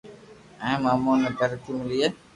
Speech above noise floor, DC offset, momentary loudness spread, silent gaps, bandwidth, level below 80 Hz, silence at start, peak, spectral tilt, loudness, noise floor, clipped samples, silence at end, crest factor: 24 dB; under 0.1%; 8 LU; none; 11.5 kHz; -58 dBFS; 0.05 s; -10 dBFS; -6 dB/octave; -25 LUFS; -48 dBFS; under 0.1%; 0.2 s; 16 dB